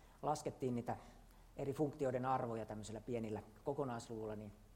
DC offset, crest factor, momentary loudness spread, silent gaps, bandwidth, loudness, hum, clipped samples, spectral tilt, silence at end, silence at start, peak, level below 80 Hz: under 0.1%; 18 dB; 9 LU; none; 16 kHz; -43 LUFS; none; under 0.1%; -6.5 dB/octave; 0 s; 0 s; -26 dBFS; -66 dBFS